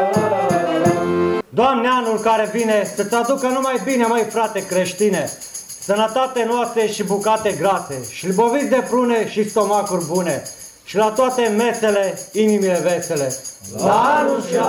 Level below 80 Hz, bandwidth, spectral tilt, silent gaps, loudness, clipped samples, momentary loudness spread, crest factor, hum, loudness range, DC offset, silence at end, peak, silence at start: -58 dBFS; 18 kHz; -4.5 dB/octave; none; -18 LUFS; under 0.1%; 7 LU; 14 dB; none; 2 LU; under 0.1%; 0 s; -4 dBFS; 0 s